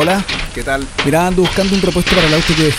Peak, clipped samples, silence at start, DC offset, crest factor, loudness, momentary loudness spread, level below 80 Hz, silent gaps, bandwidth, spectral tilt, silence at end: 0 dBFS; under 0.1%; 0 s; under 0.1%; 14 dB; -14 LUFS; 8 LU; -26 dBFS; none; 16 kHz; -4.5 dB/octave; 0 s